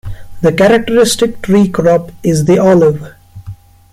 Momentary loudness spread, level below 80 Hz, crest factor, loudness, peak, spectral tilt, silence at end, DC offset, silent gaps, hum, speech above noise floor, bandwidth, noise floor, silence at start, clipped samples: 14 LU; -36 dBFS; 10 dB; -10 LUFS; 0 dBFS; -5.5 dB/octave; 0.4 s; under 0.1%; none; none; 22 dB; 16 kHz; -31 dBFS; 0.05 s; under 0.1%